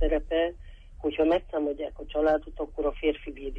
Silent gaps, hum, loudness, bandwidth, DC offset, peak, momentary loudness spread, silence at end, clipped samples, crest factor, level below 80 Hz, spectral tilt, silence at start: none; none; -29 LUFS; 6 kHz; under 0.1%; -14 dBFS; 9 LU; 0 s; under 0.1%; 14 dB; -38 dBFS; -7.5 dB/octave; 0 s